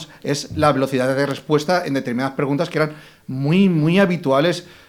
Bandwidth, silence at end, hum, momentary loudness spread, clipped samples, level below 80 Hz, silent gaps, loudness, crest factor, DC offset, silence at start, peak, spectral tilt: 16 kHz; 0.25 s; none; 8 LU; under 0.1%; -56 dBFS; none; -19 LUFS; 16 dB; under 0.1%; 0 s; -2 dBFS; -6 dB/octave